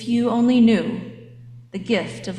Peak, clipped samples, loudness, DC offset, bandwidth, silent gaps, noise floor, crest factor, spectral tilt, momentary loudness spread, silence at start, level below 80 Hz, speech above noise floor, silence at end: -6 dBFS; under 0.1%; -19 LUFS; under 0.1%; 10 kHz; none; -42 dBFS; 14 dB; -6.5 dB/octave; 18 LU; 0 s; -58 dBFS; 23 dB; 0 s